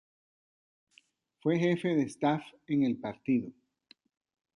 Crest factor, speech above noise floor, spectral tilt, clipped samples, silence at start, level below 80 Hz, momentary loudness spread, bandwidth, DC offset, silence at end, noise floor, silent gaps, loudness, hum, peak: 18 dB; 37 dB; -7 dB/octave; under 0.1%; 1.45 s; -74 dBFS; 8 LU; 11.5 kHz; under 0.1%; 1.05 s; -67 dBFS; none; -31 LUFS; none; -16 dBFS